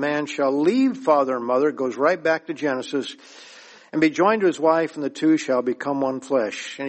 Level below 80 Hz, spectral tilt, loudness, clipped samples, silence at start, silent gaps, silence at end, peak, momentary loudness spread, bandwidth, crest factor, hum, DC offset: -72 dBFS; -5 dB/octave; -22 LUFS; under 0.1%; 0 s; none; 0 s; -4 dBFS; 8 LU; 8.8 kHz; 18 dB; none; under 0.1%